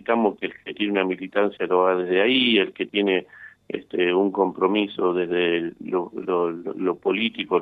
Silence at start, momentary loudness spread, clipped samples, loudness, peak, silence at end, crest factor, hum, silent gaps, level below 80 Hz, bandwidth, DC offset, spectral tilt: 0.1 s; 8 LU; under 0.1%; -23 LUFS; -6 dBFS; 0 s; 16 dB; none; none; -68 dBFS; 4.7 kHz; under 0.1%; -7.5 dB/octave